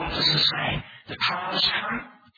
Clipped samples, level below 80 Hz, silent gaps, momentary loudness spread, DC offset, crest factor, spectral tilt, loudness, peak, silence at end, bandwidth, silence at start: under 0.1%; -48 dBFS; none; 14 LU; under 0.1%; 18 dB; -4 dB/octave; -23 LUFS; -8 dBFS; 0.25 s; 5 kHz; 0 s